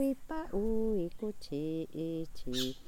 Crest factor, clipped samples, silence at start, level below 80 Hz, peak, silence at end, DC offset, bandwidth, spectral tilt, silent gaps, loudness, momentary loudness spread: 14 dB; under 0.1%; 0 s; -48 dBFS; -20 dBFS; 0 s; under 0.1%; 19 kHz; -5.5 dB/octave; none; -37 LUFS; 6 LU